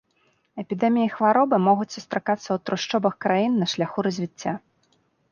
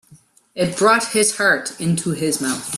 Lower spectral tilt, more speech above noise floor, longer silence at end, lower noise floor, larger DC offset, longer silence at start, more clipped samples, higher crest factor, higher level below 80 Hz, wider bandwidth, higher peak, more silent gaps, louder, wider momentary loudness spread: first, -5.5 dB/octave vs -3.5 dB/octave; first, 44 dB vs 32 dB; first, 0.75 s vs 0 s; first, -66 dBFS vs -51 dBFS; neither; first, 0.55 s vs 0.1 s; neither; about the same, 18 dB vs 18 dB; second, -70 dBFS vs -60 dBFS; second, 7.2 kHz vs 15.5 kHz; second, -6 dBFS vs -2 dBFS; neither; second, -23 LUFS vs -18 LUFS; first, 12 LU vs 8 LU